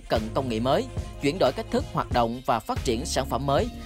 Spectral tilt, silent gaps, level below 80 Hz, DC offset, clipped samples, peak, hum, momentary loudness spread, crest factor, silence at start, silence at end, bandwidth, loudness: -5.5 dB/octave; none; -38 dBFS; under 0.1%; under 0.1%; -10 dBFS; none; 4 LU; 16 dB; 0 s; 0 s; 16 kHz; -26 LUFS